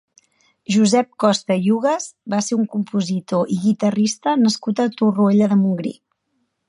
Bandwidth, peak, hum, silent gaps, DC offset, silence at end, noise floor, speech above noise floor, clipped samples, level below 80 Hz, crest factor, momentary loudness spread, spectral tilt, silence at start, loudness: 11.5 kHz; -2 dBFS; none; none; under 0.1%; 0.75 s; -70 dBFS; 53 dB; under 0.1%; -68 dBFS; 16 dB; 7 LU; -5.5 dB/octave; 0.7 s; -19 LUFS